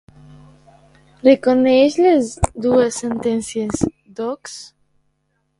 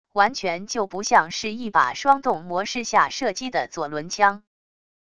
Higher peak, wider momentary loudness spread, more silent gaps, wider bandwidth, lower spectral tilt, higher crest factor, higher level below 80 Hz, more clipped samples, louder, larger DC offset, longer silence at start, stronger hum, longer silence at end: about the same, 0 dBFS vs -2 dBFS; first, 14 LU vs 8 LU; neither; about the same, 11.5 kHz vs 11 kHz; first, -5.5 dB/octave vs -2.5 dB/octave; about the same, 18 dB vs 20 dB; first, -40 dBFS vs -60 dBFS; neither; first, -17 LUFS vs -22 LUFS; second, under 0.1% vs 0.4%; first, 1.25 s vs 0.15 s; neither; first, 0.95 s vs 0.75 s